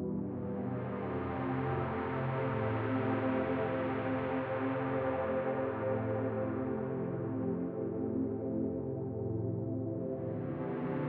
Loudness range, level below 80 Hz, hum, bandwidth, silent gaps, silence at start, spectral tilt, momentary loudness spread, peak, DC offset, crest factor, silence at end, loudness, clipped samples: 3 LU; -62 dBFS; none; 4.6 kHz; none; 0 s; -7.5 dB/octave; 4 LU; -22 dBFS; under 0.1%; 12 dB; 0 s; -36 LUFS; under 0.1%